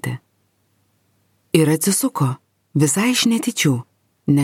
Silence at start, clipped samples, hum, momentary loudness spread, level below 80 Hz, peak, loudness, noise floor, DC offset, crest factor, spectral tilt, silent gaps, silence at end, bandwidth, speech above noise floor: 0.05 s; under 0.1%; none; 13 LU; -60 dBFS; 0 dBFS; -18 LUFS; -65 dBFS; under 0.1%; 20 dB; -4.5 dB/octave; none; 0 s; 17 kHz; 47 dB